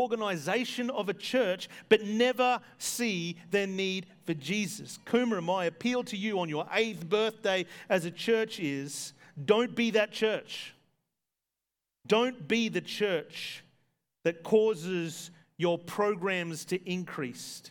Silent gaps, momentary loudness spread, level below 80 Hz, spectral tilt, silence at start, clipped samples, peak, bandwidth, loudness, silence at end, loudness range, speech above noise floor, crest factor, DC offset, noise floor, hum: none; 11 LU; -82 dBFS; -4 dB/octave; 0 s; under 0.1%; -8 dBFS; 19 kHz; -30 LUFS; 0 s; 3 LU; 58 dB; 22 dB; under 0.1%; -89 dBFS; none